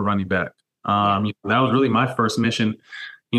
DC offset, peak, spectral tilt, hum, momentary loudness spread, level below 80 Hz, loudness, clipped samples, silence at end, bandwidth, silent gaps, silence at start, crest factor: under 0.1%; -6 dBFS; -6 dB/octave; none; 14 LU; -60 dBFS; -20 LUFS; under 0.1%; 0 s; 12.5 kHz; none; 0 s; 14 dB